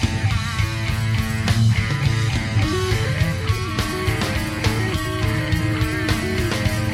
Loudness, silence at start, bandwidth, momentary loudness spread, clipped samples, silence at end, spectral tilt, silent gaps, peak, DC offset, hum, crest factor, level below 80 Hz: -21 LUFS; 0 s; 15.5 kHz; 4 LU; under 0.1%; 0 s; -5.5 dB/octave; none; -4 dBFS; under 0.1%; none; 16 dB; -30 dBFS